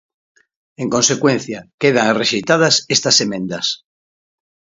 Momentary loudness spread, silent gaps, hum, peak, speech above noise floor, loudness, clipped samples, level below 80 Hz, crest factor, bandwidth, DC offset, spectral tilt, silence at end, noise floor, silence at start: 9 LU; 1.74-1.78 s; none; 0 dBFS; over 74 dB; -15 LUFS; under 0.1%; -60 dBFS; 18 dB; 8 kHz; under 0.1%; -3 dB/octave; 1 s; under -90 dBFS; 0.8 s